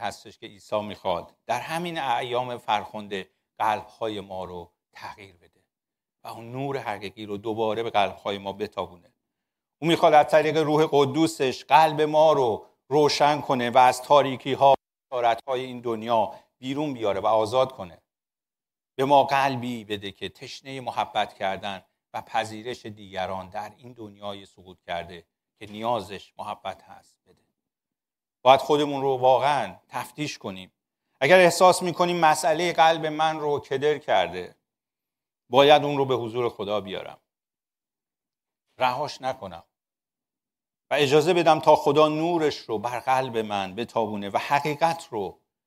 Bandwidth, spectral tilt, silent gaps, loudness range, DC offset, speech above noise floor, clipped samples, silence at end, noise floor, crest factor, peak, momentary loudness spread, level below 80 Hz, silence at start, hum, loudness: 16 kHz; -4.5 dB/octave; none; 13 LU; under 0.1%; over 66 dB; under 0.1%; 0.35 s; under -90 dBFS; 22 dB; -2 dBFS; 19 LU; -68 dBFS; 0 s; none; -23 LUFS